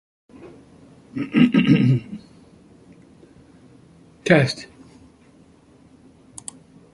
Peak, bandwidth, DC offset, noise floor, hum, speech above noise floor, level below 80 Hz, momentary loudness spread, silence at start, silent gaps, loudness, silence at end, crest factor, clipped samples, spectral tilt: -2 dBFS; 11.5 kHz; under 0.1%; -52 dBFS; none; 34 dB; -58 dBFS; 23 LU; 0.45 s; none; -19 LUFS; 2.3 s; 22 dB; under 0.1%; -6.5 dB/octave